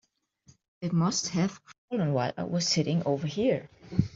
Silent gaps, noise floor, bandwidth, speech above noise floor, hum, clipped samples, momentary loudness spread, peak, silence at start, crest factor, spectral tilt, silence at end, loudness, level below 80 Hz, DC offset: 1.78-1.88 s; -62 dBFS; 7.8 kHz; 34 dB; none; under 0.1%; 6 LU; -10 dBFS; 0.8 s; 20 dB; -5 dB/octave; 0.05 s; -29 LUFS; -58 dBFS; under 0.1%